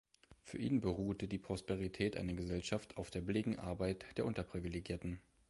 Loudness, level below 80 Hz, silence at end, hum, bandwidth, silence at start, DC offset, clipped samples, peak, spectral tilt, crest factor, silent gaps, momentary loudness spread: -41 LUFS; -56 dBFS; 0.3 s; none; 11.5 kHz; 0.3 s; under 0.1%; under 0.1%; -24 dBFS; -6.5 dB/octave; 18 dB; none; 7 LU